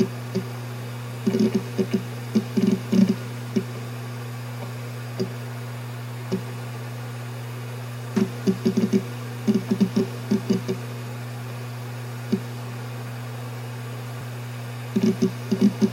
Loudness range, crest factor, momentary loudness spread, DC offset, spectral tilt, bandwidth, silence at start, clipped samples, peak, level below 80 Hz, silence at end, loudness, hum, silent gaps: 8 LU; 20 dB; 12 LU; under 0.1%; -7 dB/octave; 16.5 kHz; 0 s; under 0.1%; -6 dBFS; -64 dBFS; 0 s; -27 LUFS; none; none